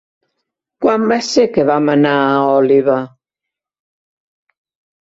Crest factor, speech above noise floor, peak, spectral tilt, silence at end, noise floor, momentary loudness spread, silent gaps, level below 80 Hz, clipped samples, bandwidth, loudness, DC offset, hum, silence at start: 14 dB; 71 dB; -2 dBFS; -5.5 dB/octave; 2.05 s; -83 dBFS; 6 LU; none; -58 dBFS; under 0.1%; 8 kHz; -13 LUFS; under 0.1%; none; 0.8 s